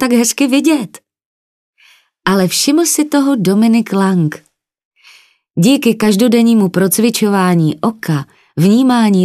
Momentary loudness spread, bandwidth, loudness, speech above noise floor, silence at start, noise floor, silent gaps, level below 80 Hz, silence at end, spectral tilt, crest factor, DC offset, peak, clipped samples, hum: 9 LU; 14 kHz; -12 LUFS; 38 dB; 0 s; -50 dBFS; 1.25-1.73 s, 4.85-4.91 s; -58 dBFS; 0 s; -5 dB/octave; 12 dB; under 0.1%; 0 dBFS; under 0.1%; none